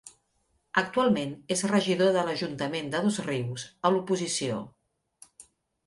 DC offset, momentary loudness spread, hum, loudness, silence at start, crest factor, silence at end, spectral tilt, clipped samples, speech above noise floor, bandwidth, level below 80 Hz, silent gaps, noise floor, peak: under 0.1%; 8 LU; none; -28 LUFS; 0.05 s; 22 dB; 0.45 s; -4.5 dB/octave; under 0.1%; 45 dB; 11.5 kHz; -68 dBFS; none; -73 dBFS; -8 dBFS